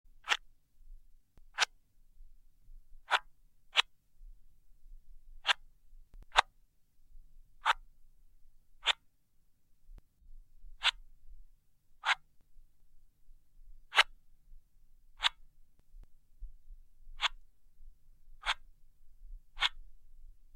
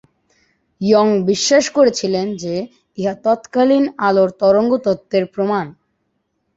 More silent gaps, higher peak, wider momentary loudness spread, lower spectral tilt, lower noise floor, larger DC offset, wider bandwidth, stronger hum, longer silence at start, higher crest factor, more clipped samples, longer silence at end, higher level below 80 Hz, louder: neither; second, -6 dBFS vs 0 dBFS; second, 7 LU vs 10 LU; second, 1.5 dB/octave vs -4.5 dB/octave; about the same, -68 dBFS vs -69 dBFS; neither; first, 16.5 kHz vs 8 kHz; neither; second, 0.1 s vs 0.8 s; first, 34 dB vs 16 dB; neither; second, 0.15 s vs 0.85 s; about the same, -54 dBFS vs -58 dBFS; second, -33 LUFS vs -16 LUFS